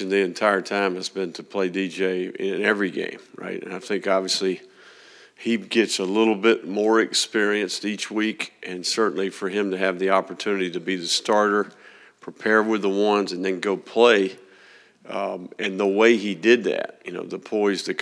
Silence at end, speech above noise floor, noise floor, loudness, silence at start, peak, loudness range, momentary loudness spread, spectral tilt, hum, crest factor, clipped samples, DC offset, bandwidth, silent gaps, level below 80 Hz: 0 s; 29 dB; -52 dBFS; -23 LUFS; 0 s; -2 dBFS; 4 LU; 12 LU; -3.5 dB/octave; none; 20 dB; under 0.1%; under 0.1%; 11 kHz; none; -86 dBFS